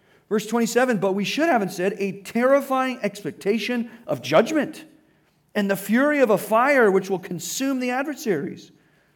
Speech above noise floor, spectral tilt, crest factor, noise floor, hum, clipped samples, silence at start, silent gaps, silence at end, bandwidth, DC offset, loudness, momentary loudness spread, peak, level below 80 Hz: 40 dB; -4.5 dB/octave; 16 dB; -62 dBFS; none; under 0.1%; 0.3 s; none; 0.5 s; 19 kHz; under 0.1%; -22 LUFS; 10 LU; -6 dBFS; -74 dBFS